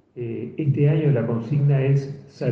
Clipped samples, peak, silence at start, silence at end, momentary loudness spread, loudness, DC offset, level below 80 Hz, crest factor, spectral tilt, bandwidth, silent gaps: under 0.1%; -8 dBFS; 0.15 s; 0 s; 12 LU; -22 LUFS; under 0.1%; -58 dBFS; 14 dB; -10 dB/octave; 6 kHz; none